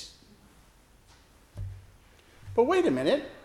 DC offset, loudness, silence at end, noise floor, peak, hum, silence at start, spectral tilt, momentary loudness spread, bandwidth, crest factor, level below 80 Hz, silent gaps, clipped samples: under 0.1%; -26 LUFS; 0.05 s; -58 dBFS; -10 dBFS; none; 0 s; -6 dB/octave; 24 LU; 13.5 kHz; 20 dB; -54 dBFS; none; under 0.1%